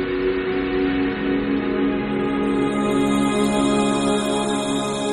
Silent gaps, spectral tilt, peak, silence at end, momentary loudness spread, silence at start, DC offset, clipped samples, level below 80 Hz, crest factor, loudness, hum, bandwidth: none; -5 dB/octave; -6 dBFS; 0 s; 3 LU; 0 s; under 0.1%; under 0.1%; -42 dBFS; 14 dB; -21 LUFS; none; 12.5 kHz